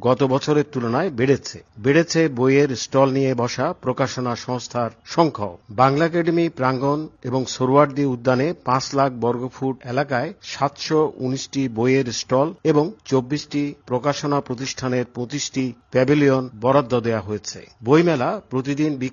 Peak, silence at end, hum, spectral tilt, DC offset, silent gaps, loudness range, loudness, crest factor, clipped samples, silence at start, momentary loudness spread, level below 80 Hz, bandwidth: -2 dBFS; 0 s; none; -5.5 dB/octave; under 0.1%; none; 3 LU; -21 LUFS; 20 dB; under 0.1%; 0 s; 9 LU; -58 dBFS; 7.4 kHz